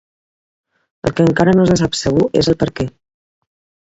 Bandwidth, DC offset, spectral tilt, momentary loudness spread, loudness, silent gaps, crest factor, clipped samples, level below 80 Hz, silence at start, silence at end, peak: 8 kHz; under 0.1%; -6 dB/octave; 11 LU; -15 LUFS; none; 16 dB; under 0.1%; -40 dBFS; 1.05 s; 0.95 s; 0 dBFS